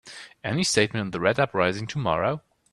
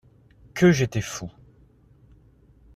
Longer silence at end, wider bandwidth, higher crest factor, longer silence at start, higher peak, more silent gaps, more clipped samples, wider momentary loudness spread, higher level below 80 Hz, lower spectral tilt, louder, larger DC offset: second, 0.35 s vs 1.45 s; about the same, 13.5 kHz vs 14 kHz; about the same, 22 dB vs 20 dB; second, 0.05 s vs 0.55 s; first, -4 dBFS vs -8 dBFS; neither; neither; second, 11 LU vs 19 LU; about the same, -56 dBFS vs -52 dBFS; second, -4 dB/octave vs -6 dB/octave; about the same, -24 LUFS vs -22 LUFS; neither